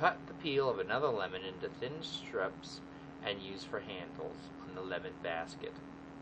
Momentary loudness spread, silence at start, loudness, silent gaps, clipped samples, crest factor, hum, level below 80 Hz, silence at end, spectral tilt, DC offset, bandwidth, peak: 14 LU; 0 s; -39 LUFS; none; under 0.1%; 24 dB; none; -66 dBFS; 0 s; -5 dB/octave; under 0.1%; 8.8 kHz; -14 dBFS